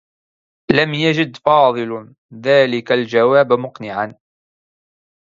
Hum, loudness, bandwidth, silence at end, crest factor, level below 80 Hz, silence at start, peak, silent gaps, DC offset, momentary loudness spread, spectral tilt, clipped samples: none; -16 LUFS; 7.4 kHz; 1.1 s; 18 dB; -56 dBFS; 0.7 s; 0 dBFS; 2.18-2.29 s; under 0.1%; 12 LU; -6.5 dB/octave; under 0.1%